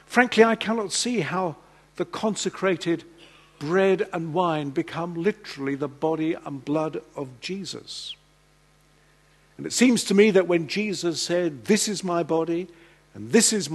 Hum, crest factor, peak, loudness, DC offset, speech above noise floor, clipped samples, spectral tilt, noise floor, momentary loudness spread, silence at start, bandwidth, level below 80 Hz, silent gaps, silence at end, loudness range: 50 Hz at -60 dBFS; 24 dB; -2 dBFS; -24 LUFS; under 0.1%; 36 dB; under 0.1%; -4 dB/octave; -59 dBFS; 15 LU; 0.1 s; 12.5 kHz; -64 dBFS; none; 0 s; 8 LU